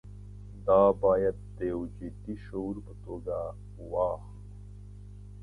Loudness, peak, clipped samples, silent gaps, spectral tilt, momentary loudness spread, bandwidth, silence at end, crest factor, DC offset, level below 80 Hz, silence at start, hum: -30 LUFS; -10 dBFS; under 0.1%; none; -9.5 dB/octave; 25 LU; 10.5 kHz; 0 s; 22 dB; under 0.1%; -48 dBFS; 0.05 s; 50 Hz at -45 dBFS